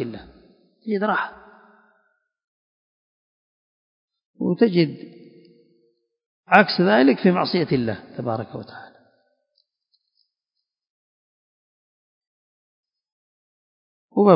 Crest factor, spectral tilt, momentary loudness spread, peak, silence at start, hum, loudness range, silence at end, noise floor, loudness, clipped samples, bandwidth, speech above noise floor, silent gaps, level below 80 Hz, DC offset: 24 dB; -9 dB/octave; 23 LU; 0 dBFS; 0 s; none; 15 LU; 0 s; -83 dBFS; -20 LUFS; under 0.1%; 5.4 kHz; 63 dB; 2.44-4.08 s, 4.25-4.34 s, 6.26-6.44 s, 10.90-12.21 s, 12.27-12.83 s, 13.12-14.09 s; -64 dBFS; under 0.1%